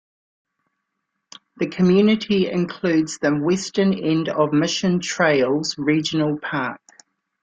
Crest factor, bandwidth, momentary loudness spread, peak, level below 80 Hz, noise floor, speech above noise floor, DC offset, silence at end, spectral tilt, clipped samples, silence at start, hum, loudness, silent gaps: 16 dB; 9.2 kHz; 8 LU; -6 dBFS; -60 dBFS; -77 dBFS; 58 dB; under 0.1%; 0.65 s; -5.5 dB/octave; under 0.1%; 1.55 s; none; -20 LUFS; none